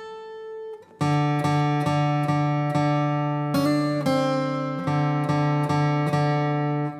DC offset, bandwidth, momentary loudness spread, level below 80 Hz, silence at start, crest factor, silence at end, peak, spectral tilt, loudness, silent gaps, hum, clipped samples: under 0.1%; 13.5 kHz; 10 LU; -66 dBFS; 0 s; 12 dB; 0 s; -10 dBFS; -7.5 dB/octave; -23 LUFS; none; none; under 0.1%